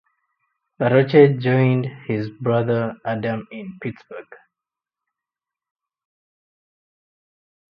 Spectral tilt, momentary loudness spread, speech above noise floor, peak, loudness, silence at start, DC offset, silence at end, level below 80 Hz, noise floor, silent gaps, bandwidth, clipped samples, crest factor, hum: -10.5 dB/octave; 19 LU; 69 dB; 0 dBFS; -19 LUFS; 0.8 s; under 0.1%; 3.35 s; -64 dBFS; -88 dBFS; none; 5.4 kHz; under 0.1%; 22 dB; none